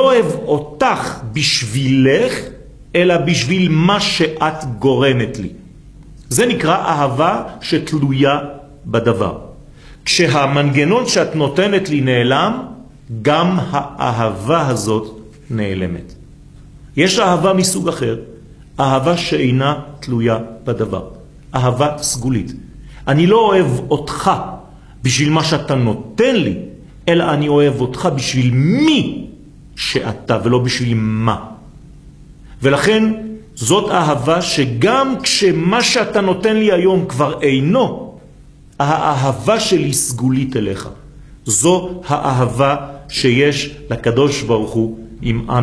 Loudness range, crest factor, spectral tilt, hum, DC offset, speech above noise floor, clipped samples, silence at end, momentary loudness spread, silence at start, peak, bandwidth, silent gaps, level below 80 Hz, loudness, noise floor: 4 LU; 16 dB; -5 dB/octave; none; under 0.1%; 27 dB; under 0.1%; 0 s; 11 LU; 0 s; 0 dBFS; 11 kHz; none; -42 dBFS; -15 LUFS; -41 dBFS